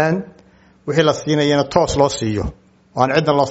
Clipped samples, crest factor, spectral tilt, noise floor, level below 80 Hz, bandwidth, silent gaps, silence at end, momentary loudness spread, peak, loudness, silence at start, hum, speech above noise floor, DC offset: under 0.1%; 18 dB; -5.5 dB/octave; -49 dBFS; -38 dBFS; 8.2 kHz; none; 0 s; 14 LU; 0 dBFS; -17 LUFS; 0 s; none; 33 dB; under 0.1%